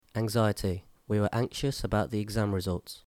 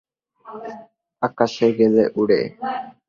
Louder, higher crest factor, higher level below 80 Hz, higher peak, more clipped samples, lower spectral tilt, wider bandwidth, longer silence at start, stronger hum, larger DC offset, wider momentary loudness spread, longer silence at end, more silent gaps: second, -30 LUFS vs -19 LUFS; about the same, 16 dB vs 18 dB; first, -48 dBFS vs -62 dBFS; second, -14 dBFS vs -2 dBFS; neither; about the same, -6 dB/octave vs -6.5 dB/octave; first, 16.5 kHz vs 7.2 kHz; second, 0.15 s vs 0.45 s; neither; neither; second, 6 LU vs 19 LU; about the same, 0.1 s vs 0.2 s; neither